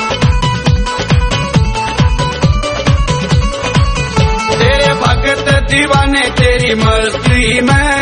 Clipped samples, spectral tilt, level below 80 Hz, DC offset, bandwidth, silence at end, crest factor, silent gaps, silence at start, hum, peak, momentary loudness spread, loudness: under 0.1%; -5 dB/octave; -18 dBFS; 0.2%; 10.5 kHz; 0 s; 10 dB; none; 0 s; none; 0 dBFS; 4 LU; -11 LUFS